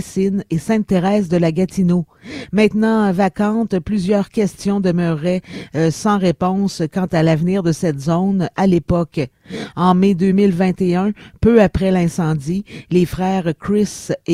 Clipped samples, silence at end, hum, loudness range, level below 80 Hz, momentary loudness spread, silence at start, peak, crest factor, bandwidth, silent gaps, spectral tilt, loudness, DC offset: under 0.1%; 0 s; none; 2 LU; -40 dBFS; 7 LU; 0 s; 0 dBFS; 16 dB; 12.5 kHz; none; -7 dB/octave; -17 LUFS; under 0.1%